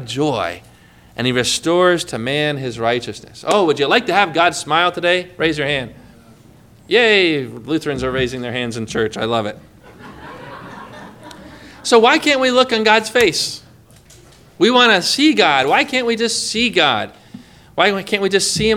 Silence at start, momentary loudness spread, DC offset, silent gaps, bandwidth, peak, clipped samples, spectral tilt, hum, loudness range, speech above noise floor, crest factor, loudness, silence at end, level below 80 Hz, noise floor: 0 s; 19 LU; under 0.1%; none; 16.5 kHz; 0 dBFS; under 0.1%; -3.5 dB/octave; none; 8 LU; 30 dB; 18 dB; -15 LUFS; 0 s; -48 dBFS; -45 dBFS